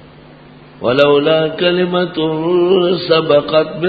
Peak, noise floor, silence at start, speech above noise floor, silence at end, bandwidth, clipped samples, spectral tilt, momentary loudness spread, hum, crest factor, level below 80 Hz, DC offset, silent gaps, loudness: 0 dBFS; -39 dBFS; 0.8 s; 26 dB; 0 s; 5 kHz; under 0.1%; -8 dB/octave; 6 LU; none; 14 dB; -50 dBFS; under 0.1%; none; -13 LUFS